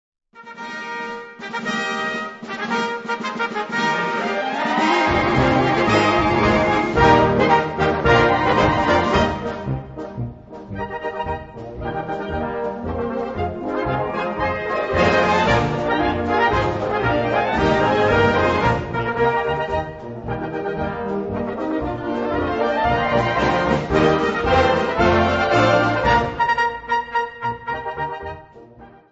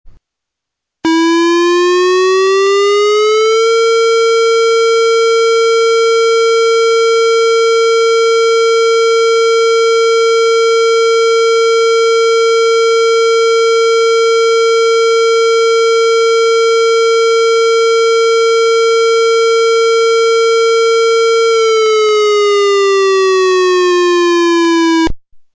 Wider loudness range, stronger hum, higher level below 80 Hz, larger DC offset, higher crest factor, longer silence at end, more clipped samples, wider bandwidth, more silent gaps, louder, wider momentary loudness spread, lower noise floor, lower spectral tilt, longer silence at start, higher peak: first, 9 LU vs 0 LU; neither; first, -38 dBFS vs -48 dBFS; neither; first, 18 dB vs 2 dB; about the same, 0.25 s vs 0.2 s; neither; about the same, 8 kHz vs 8 kHz; neither; second, -19 LUFS vs -10 LUFS; first, 13 LU vs 0 LU; second, -44 dBFS vs -79 dBFS; first, -6 dB/octave vs -1.5 dB/octave; first, 0.35 s vs 0.05 s; first, 0 dBFS vs -8 dBFS